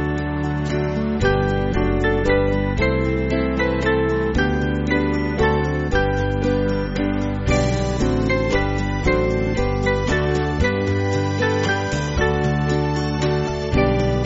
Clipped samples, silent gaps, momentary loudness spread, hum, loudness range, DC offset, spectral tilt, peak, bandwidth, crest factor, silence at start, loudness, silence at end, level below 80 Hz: under 0.1%; none; 3 LU; none; 1 LU; under 0.1%; -5.5 dB/octave; -4 dBFS; 8 kHz; 16 dB; 0 s; -20 LUFS; 0 s; -28 dBFS